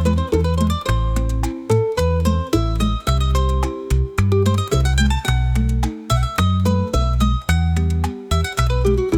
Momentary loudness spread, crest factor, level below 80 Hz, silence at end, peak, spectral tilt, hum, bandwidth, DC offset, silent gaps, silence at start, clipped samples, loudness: 4 LU; 12 dB; -22 dBFS; 0 s; -4 dBFS; -6 dB/octave; none; 16.5 kHz; under 0.1%; none; 0 s; under 0.1%; -19 LUFS